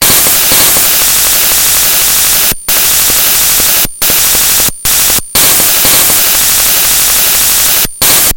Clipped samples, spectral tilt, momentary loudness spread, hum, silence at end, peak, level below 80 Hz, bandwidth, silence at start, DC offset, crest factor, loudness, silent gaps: 2%; 0.5 dB/octave; 3 LU; none; 0 s; 0 dBFS; -30 dBFS; over 20 kHz; 0 s; under 0.1%; 8 dB; -4 LUFS; none